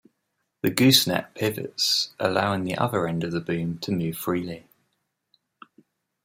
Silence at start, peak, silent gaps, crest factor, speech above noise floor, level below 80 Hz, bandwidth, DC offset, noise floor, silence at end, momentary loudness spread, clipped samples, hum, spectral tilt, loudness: 0.65 s; -2 dBFS; none; 24 dB; 53 dB; -62 dBFS; 16 kHz; under 0.1%; -77 dBFS; 1.65 s; 11 LU; under 0.1%; none; -4 dB/octave; -24 LUFS